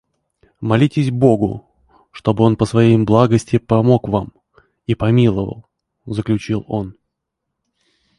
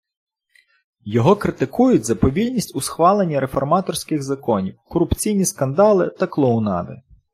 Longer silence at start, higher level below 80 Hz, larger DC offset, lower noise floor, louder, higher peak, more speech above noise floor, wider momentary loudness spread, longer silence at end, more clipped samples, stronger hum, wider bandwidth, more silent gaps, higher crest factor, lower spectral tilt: second, 0.6 s vs 1.05 s; about the same, -44 dBFS vs -42 dBFS; neither; first, -78 dBFS vs -59 dBFS; first, -16 LUFS vs -19 LUFS; about the same, 0 dBFS vs -2 dBFS; first, 63 dB vs 41 dB; first, 14 LU vs 8 LU; first, 1.3 s vs 0.35 s; neither; neither; second, 11 kHz vs 15.5 kHz; neither; about the same, 16 dB vs 16 dB; first, -8 dB/octave vs -6 dB/octave